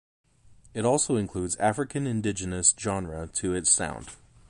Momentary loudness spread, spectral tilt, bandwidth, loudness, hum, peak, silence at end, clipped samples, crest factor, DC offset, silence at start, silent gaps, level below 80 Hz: 11 LU; -3.5 dB/octave; 11.5 kHz; -26 LUFS; none; -8 dBFS; 0.35 s; under 0.1%; 20 dB; under 0.1%; 0.5 s; none; -50 dBFS